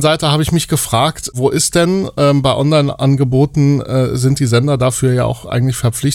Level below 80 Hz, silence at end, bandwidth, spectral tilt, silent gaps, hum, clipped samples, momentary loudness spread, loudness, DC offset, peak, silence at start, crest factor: -38 dBFS; 0 s; 16.5 kHz; -5.5 dB/octave; none; none; under 0.1%; 4 LU; -14 LUFS; under 0.1%; 0 dBFS; 0 s; 12 dB